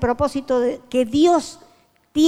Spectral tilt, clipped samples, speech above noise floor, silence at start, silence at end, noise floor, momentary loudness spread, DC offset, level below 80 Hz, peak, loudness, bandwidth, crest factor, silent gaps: -5.5 dB/octave; under 0.1%; 20 dB; 0 s; 0 s; -39 dBFS; 8 LU; under 0.1%; -44 dBFS; -6 dBFS; -20 LUFS; 14.5 kHz; 14 dB; none